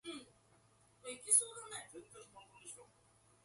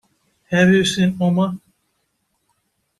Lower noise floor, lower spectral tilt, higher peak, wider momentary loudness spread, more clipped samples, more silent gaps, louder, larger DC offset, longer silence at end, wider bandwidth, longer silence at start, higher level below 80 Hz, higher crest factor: about the same, -70 dBFS vs -70 dBFS; second, 0 dB/octave vs -5.5 dB/octave; second, -16 dBFS vs -4 dBFS; first, 26 LU vs 9 LU; neither; neither; second, -35 LUFS vs -17 LUFS; neither; second, 0.6 s vs 1.4 s; about the same, 12 kHz vs 12 kHz; second, 0.05 s vs 0.5 s; second, -82 dBFS vs -56 dBFS; first, 26 dB vs 16 dB